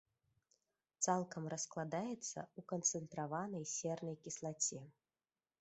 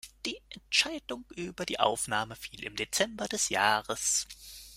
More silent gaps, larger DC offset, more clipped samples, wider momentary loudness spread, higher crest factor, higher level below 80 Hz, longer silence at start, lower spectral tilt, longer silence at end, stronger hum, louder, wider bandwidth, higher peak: neither; neither; neither; second, 8 LU vs 14 LU; about the same, 22 dB vs 24 dB; second, -84 dBFS vs -60 dBFS; first, 1 s vs 0.05 s; first, -4 dB/octave vs -1 dB/octave; first, 0.7 s vs 0 s; neither; second, -42 LUFS vs -30 LUFS; second, 8.2 kHz vs 16 kHz; second, -22 dBFS vs -10 dBFS